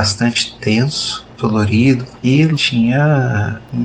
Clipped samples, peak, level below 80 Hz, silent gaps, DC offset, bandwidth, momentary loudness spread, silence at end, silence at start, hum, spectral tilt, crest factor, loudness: under 0.1%; -2 dBFS; -44 dBFS; none; under 0.1%; 9.6 kHz; 7 LU; 0 s; 0 s; none; -5.5 dB/octave; 14 dB; -15 LUFS